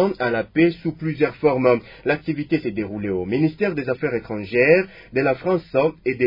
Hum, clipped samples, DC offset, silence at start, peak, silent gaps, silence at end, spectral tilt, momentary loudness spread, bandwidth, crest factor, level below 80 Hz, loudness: none; under 0.1%; under 0.1%; 0 s; -2 dBFS; none; 0 s; -9.5 dB/octave; 8 LU; 5.4 kHz; 18 dB; -52 dBFS; -21 LUFS